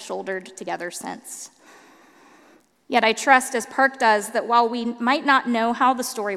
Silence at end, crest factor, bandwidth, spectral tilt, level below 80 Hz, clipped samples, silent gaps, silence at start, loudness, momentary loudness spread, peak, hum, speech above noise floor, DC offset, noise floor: 0 s; 22 dB; 15.5 kHz; -2.5 dB/octave; -74 dBFS; under 0.1%; none; 0 s; -21 LUFS; 16 LU; 0 dBFS; none; 34 dB; under 0.1%; -55 dBFS